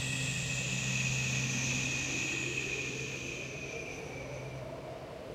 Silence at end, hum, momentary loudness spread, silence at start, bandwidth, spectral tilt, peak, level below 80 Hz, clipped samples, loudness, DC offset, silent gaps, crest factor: 0 s; none; 11 LU; 0 s; 15.5 kHz; -3 dB/octave; -22 dBFS; -56 dBFS; under 0.1%; -34 LUFS; under 0.1%; none; 14 dB